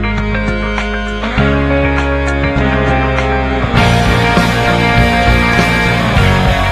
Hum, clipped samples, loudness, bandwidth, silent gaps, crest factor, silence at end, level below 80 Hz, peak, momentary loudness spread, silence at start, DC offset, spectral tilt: none; under 0.1%; -12 LUFS; 14 kHz; none; 12 dB; 0 s; -18 dBFS; 0 dBFS; 6 LU; 0 s; under 0.1%; -6 dB/octave